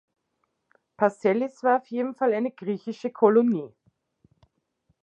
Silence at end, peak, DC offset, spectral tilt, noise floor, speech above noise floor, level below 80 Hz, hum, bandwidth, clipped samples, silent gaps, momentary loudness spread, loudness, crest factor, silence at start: 1.35 s; -6 dBFS; under 0.1%; -7.5 dB/octave; -76 dBFS; 52 dB; -78 dBFS; none; 8.6 kHz; under 0.1%; none; 11 LU; -25 LUFS; 22 dB; 1 s